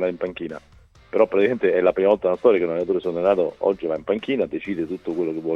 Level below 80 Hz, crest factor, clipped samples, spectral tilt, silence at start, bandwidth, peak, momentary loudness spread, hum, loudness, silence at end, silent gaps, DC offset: -56 dBFS; 18 dB; under 0.1%; -8 dB/octave; 0 s; 6.4 kHz; -4 dBFS; 9 LU; none; -22 LUFS; 0 s; none; under 0.1%